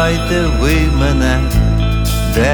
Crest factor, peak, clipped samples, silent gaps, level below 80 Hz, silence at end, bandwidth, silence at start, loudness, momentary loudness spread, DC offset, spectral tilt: 12 dB; -2 dBFS; under 0.1%; none; -16 dBFS; 0 s; 20 kHz; 0 s; -14 LUFS; 2 LU; under 0.1%; -5.5 dB/octave